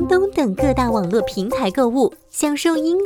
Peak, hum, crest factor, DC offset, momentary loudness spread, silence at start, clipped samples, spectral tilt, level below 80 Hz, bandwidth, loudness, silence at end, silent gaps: -4 dBFS; none; 14 dB; under 0.1%; 4 LU; 0 s; under 0.1%; -5 dB/octave; -38 dBFS; 19.5 kHz; -19 LUFS; 0 s; none